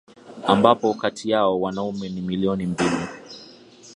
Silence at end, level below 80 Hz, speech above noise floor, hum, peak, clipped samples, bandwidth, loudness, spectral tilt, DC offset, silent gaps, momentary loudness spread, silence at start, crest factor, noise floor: 0 s; -54 dBFS; 25 dB; none; 0 dBFS; under 0.1%; 11 kHz; -22 LUFS; -6 dB/octave; under 0.1%; none; 16 LU; 0.25 s; 22 dB; -47 dBFS